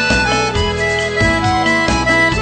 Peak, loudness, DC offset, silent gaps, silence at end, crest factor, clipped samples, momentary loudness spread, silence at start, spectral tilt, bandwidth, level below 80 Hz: -2 dBFS; -14 LUFS; under 0.1%; none; 0 s; 12 dB; under 0.1%; 4 LU; 0 s; -4 dB/octave; 9.2 kHz; -28 dBFS